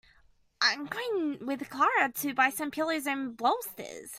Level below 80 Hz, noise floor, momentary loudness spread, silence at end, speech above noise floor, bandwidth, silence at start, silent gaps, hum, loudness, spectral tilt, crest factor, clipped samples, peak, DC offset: -72 dBFS; -64 dBFS; 9 LU; 0 s; 33 dB; 16 kHz; 0.6 s; none; none; -29 LUFS; -2 dB/octave; 22 dB; under 0.1%; -10 dBFS; under 0.1%